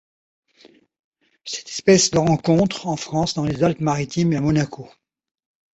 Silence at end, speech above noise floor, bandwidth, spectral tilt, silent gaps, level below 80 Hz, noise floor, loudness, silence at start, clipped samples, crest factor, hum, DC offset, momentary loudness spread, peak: 0.9 s; 34 dB; 8.2 kHz; -5 dB/octave; none; -50 dBFS; -53 dBFS; -20 LUFS; 1.45 s; under 0.1%; 18 dB; none; under 0.1%; 14 LU; -2 dBFS